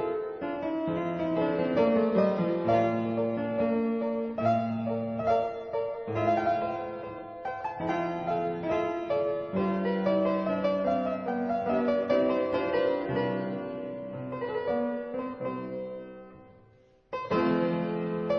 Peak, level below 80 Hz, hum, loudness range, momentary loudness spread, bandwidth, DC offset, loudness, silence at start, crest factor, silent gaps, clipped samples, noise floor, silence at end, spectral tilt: -12 dBFS; -62 dBFS; none; 6 LU; 10 LU; 6.8 kHz; under 0.1%; -29 LUFS; 0 s; 16 dB; none; under 0.1%; -60 dBFS; 0 s; -8.5 dB/octave